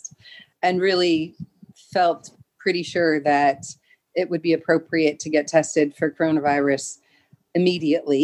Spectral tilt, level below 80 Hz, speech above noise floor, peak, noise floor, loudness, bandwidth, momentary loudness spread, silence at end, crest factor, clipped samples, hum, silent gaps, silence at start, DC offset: -4.5 dB/octave; -66 dBFS; 38 dB; -4 dBFS; -59 dBFS; -21 LUFS; 11.5 kHz; 13 LU; 0 s; 18 dB; under 0.1%; none; none; 0.05 s; under 0.1%